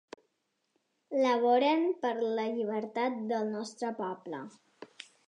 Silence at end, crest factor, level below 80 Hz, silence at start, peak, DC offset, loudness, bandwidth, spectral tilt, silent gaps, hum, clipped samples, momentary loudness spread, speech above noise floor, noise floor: 0.25 s; 16 dB; under -90 dBFS; 1.1 s; -16 dBFS; under 0.1%; -31 LUFS; 10.5 kHz; -5 dB/octave; none; none; under 0.1%; 17 LU; 49 dB; -79 dBFS